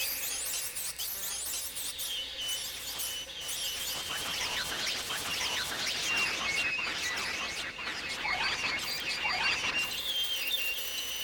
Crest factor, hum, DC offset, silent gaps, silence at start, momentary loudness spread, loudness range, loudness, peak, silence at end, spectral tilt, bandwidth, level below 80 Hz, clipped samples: 16 dB; none; under 0.1%; none; 0 s; 6 LU; 3 LU; -31 LUFS; -18 dBFS; 0 s; 0.5 dB/octave; 19.5 kHz; -60 dBFS; under 0.1%